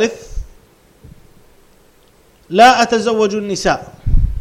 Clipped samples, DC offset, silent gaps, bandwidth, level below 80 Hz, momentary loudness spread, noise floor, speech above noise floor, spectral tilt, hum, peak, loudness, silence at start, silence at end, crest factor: under 0.1%; under 0.1%; none; 13.5 kHz; -24 dBFS; 21 LU; -50 dBFS; 37 dB; -4.5 dB/octave; none; 0 dBFS; -14 LUFS; 0 s; 0 s; 16 dB